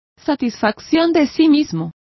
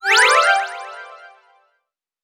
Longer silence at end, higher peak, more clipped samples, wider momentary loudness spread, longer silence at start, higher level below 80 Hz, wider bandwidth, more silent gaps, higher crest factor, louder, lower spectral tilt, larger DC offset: second, 0.25 s vs 1.1 s; about the same, -2 dBFS vs -2 dBFS; neither; second, 9 LU vs 23 LU; first, 0.25 s vs 0.05 s; first, -52 dBFS vs -78 dBFS; second, 6.2 kHz vs over 20 kHz; neither; about the same, 14 dB vs 18 dB; second, -17 LUFS vs -14 LUFS; first, -6 dB/octave vs 4 dB/octave; neither